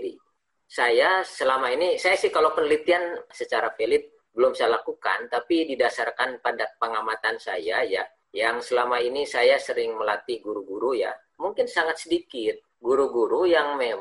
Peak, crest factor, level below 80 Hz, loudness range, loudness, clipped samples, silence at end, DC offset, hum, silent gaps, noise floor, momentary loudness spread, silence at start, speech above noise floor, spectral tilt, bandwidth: -8 dBFS; 16 dB; -66 dBFS; 3 LU; -24 LUFS; under 0.1%; 0 s; under 0.1%; none; none; -72 dBFS; 9 LU; 0 s; 48 dB; -2.5 dB/octave; 11.5 kHz